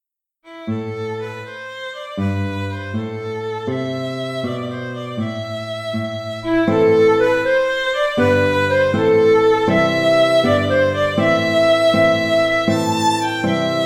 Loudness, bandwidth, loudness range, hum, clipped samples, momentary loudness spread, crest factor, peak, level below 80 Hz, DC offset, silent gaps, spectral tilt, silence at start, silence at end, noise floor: -17 LUFS; 16 kHz; 10 LU; none; under 0.1%; 13 LU; 14 dB; -4 dBFS; -52 dBFS; under 0.1%; none; -5.5 dB/octave; 0.45 s; 0 s; -50 dBFS